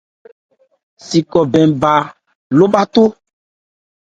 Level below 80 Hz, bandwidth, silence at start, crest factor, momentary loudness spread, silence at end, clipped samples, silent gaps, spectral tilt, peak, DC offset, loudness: -52 dBFS; 9 kHz; 1.05 s; 16 dB; 6 LU; 1.05 s; under 0.1%; 2.35-2.50 s; -6.5 dB/octave; 0 dBFS; under 0.1%; -13 LUFS